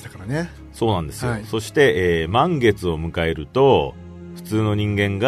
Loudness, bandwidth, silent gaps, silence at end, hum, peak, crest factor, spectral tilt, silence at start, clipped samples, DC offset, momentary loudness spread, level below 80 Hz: -20 LUFS; 13.5 kHz; none; 0 s; none; -2 dBFS; 18 dB; -6 dB/octave; 0 s; under 0.1%; under 0.1%; 12 LU; -40 dBFS